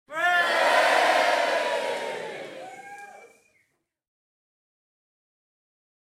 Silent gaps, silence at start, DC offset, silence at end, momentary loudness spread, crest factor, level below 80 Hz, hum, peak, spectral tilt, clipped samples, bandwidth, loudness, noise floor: none; 0.1 s; under 0.1%; 2.8 s; 22 LU; 18 dB; -82 dBFS; none; -8 dBFS; -1 dB/octave; under 0.1%; 16.5 kHz; -22 LUFS; -73 dBFS